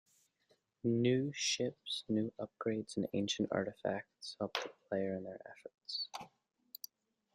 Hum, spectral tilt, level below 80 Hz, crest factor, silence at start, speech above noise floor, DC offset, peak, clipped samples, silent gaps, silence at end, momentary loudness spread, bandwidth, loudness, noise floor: none; -4.5 dB/octave; -78 dBFS; 24 dB; 0.85 s; 38 dB; under 0.1%; -16 dBFS; under 0.1%; none; 1.1 s; 17 LU; 15.5 kHz; -38 LUFS; -76 dBFS